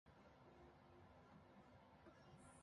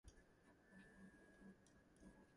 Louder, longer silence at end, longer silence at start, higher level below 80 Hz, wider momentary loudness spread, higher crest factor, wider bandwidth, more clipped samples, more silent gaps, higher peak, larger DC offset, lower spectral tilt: about the same, -68 LUFS vs -67 LUFS; about the same, 0 s vs 0 s; about the same, 0.05 s vs 0.05 s; about the same, -78 dBFS vs -76 dBFS; about the same, 2 LU vs 3 LU; about the same, 14 dB vs 16 dB; about the same, 11 kHz vs 11 kHz; neither; neither; about the same, -52 dBFS vs -52 dBFS; neither; about the same, -5.5 dB/octave vs -5.5 dB/octave